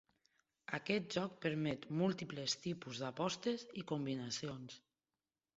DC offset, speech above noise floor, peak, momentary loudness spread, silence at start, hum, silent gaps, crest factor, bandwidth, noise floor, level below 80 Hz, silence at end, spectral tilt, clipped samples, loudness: under 0.1%; over 49 dB; -20 dBFS; 9 LU; 0.7 s; none; none; 22 dB; 7.6 kHz; under -90 dBFS; -78 dBFS; 0.8 s; -4.5 dB/octave; under 0.1%; -41 LUFS